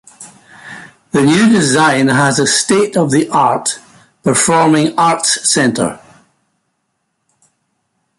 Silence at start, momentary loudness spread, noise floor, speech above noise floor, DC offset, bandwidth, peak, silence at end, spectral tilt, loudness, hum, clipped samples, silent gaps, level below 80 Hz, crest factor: 0.2 s; 10 LU; -68 dBFS; 57 dB; under 0.1%; 11.5 kHz; 0 dBFS; 2.25 s; -3.5 dB/octave; -12 LUFS; none; under 0.1%; none; -54 dBFS; 14 dB